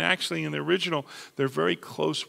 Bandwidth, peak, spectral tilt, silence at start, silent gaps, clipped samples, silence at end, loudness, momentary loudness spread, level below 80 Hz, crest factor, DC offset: 16 kHz; -6 dBFS; -4.5 dB/octave; 0 s; none; under 0.1%; 0 s; -27 LUFS; 5 LU; -72 dBFS; 22 dB; under 0.1%